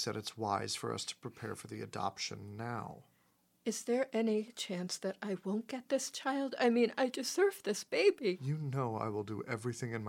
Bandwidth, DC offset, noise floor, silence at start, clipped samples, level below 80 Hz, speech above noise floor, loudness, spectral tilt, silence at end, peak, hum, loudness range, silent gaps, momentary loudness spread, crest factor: 17 kHz; under 0.1%; -73 dBFS; 0 s; under 0.1%; -80 dBFS; 37 dB; -36 LUFS; -4.5 dB/octave; 0 s; -18 dBFS; none; 7 LU; none; 12 LU; 18 dB